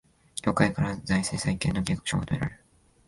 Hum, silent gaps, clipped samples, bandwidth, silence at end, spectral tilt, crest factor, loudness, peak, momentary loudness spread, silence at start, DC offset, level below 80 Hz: none; none; under 0.1%; 11.5 kHz; 0.55 s; -5 dB/octave; 22 dB; -28 LUFS; -6 dBFS; 7 LU; 0.35 s; under 0.1%; -46 dBFS